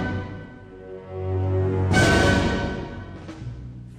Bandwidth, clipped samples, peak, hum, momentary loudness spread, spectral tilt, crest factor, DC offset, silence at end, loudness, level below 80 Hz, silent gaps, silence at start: 14 kHz; under 0.1%; -6 dBFS; none; 22 LU; -5.5 dB/octave; 18 dB; under 0.1%; 0 s; -22 LUFS; -36 dBFS; none; 0 s